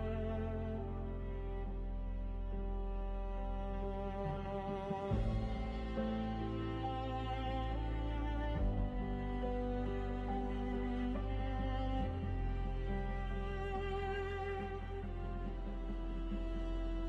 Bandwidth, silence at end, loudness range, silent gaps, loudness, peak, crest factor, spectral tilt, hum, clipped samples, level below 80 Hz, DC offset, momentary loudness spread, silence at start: 5.2 kHz; 0 s; 3 LU; none; -41 LUFS; -24 dBFS; 16 dB; -8.5 dB/octave; none; under 0.1%; -42 dBFS; under 0.1%; 5 LU; 0 s